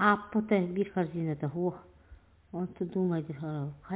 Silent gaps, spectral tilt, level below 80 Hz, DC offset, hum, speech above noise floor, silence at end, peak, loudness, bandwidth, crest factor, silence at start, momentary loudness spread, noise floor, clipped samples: none; -6.5 dB/octave; -62 dBFS; under 0.1%; none; 25 dB; 0 s; -10 dBFS; -32 LUFS; 4 kHz; 22 dB; 0 s; 10 LU; -56 dBFS; under 0.1%